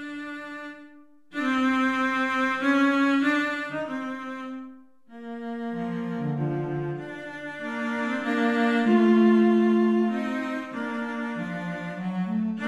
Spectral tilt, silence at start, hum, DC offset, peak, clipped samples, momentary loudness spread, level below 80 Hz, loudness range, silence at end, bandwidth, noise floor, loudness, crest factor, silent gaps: -6.5 dB/octave; 0 s; none; under 0.1%; -10 dBFS; under 0.1%; 16 LU; -66 dBFS; 10 LU; 0 s; 9.6 kHz; -52 dBFS; -25 LUFS; 16 dB; none